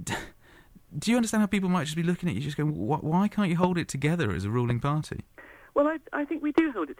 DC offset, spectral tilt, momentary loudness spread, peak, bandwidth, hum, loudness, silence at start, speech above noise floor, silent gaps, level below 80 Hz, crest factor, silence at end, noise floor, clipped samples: under 0.1%; -6 dB/octave; 8 LU; -12 dBFS; 16 kHz; none; -27 LUFS; 0 s; 28 dB; none; -54 dBFS; 16 dB; 0.05 s; -54 dBFS; under 0.1%